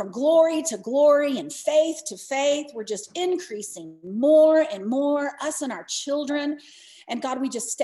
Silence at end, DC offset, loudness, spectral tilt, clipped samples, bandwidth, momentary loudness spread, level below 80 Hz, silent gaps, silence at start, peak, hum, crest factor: 0 s; under 0.1%; -23 LUFS; -3 dB/octave; under 0.1%; 12.5 kHz; 14 LU; -78 dBFS; none; 0 s; -8 dBFS; none; 16 dB